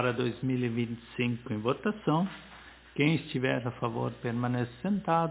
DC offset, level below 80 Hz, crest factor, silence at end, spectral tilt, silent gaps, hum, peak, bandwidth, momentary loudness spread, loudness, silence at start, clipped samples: under 0.1%; -60 dBFS; 18 dB; 0 s; -5.5 dB/octave; none; none; -12 dBFS; 4 kHz; 8 LU; -31 LUFS; 0 s; under 0.1%